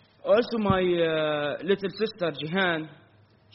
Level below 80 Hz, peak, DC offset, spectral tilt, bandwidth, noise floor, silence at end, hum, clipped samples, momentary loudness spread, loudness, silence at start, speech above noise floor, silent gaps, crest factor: -56 dBFS; -10 dBFS; under 0.1%; -4 dB/octave; 5.8 kHz; -58 dBFS; 0.6 s; none; under 0.1%; 7 LU; -26 LUFS; 0.25 s; 33 dB; none; 16 dB